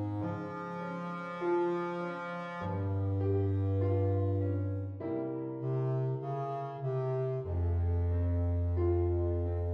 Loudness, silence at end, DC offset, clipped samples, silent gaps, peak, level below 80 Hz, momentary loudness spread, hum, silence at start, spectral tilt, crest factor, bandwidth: -34 LUFS; 0 s; under 0.1%; under 0.1%; none; -20 dBFS; -46 dBFS; 8 LU; none; 0 s; -10.5 dB/octave; 12 dB; 5.2 kHz